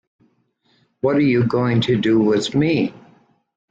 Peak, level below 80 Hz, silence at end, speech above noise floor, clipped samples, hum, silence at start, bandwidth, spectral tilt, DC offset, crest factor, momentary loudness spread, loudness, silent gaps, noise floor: -6 dBFS; -54 dBFS; 0.7 s; 46 dB; under 0.1%; none; 1.05 s; 9.2 kHz; -7 dB/octave; under 0.1%; 14 dB; 5 LU; -18 LUFS; none; -63 dBFS